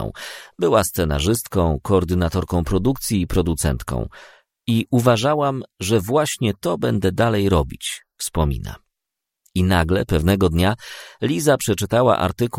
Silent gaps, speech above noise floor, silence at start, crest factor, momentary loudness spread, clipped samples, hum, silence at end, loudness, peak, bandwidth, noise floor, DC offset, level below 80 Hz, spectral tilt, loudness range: none; 64 dB; 0 s; 18 dB; 11 LU; under 0.1%; none; 0 s; -20 LUFS; -2 dBFS; 16.5 kHz; -84 dBFS; under 0.1%; -34 dBFS; -5.5 dB/octave; 2 LU